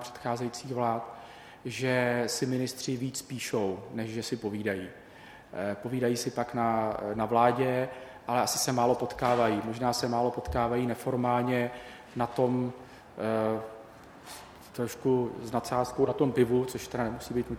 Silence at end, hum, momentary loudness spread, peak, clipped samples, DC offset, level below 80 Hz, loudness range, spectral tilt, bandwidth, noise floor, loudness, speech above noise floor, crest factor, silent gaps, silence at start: 0 s; none; 17 LU; -8 dBFS; under 0.1%; under 0.1%; -56 dBFS; 5 LU; -5 dB/octave; 17 kHz; -51 dBFS; -30 LUFS; 21 dB; 22 dB; none; 0 s